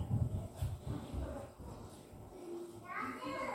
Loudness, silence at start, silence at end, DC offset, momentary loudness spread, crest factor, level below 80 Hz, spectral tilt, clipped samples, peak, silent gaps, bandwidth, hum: -44 LUFS; 0 s; 0 s; under 0.1%; 13 LU; 18 dB; -52 dBFS; -7 dB/octave; under 0.1%; -24 dBFS; none; 16.5 kHz; none